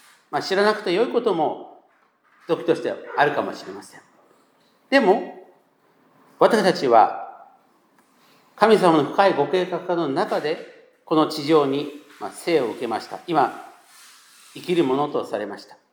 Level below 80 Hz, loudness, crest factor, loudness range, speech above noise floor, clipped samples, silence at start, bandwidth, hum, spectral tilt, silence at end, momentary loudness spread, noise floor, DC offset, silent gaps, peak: -80 dBFS; -21 LUFS; 22 dB; 6 LU; 40 dB; under 0.1%; 0.3 s; 19.5 kHz; none; -5.5 dB/octave; 0.3 s; 18 LU; -61 dBFS; under 0.1%; none; 0 dBFS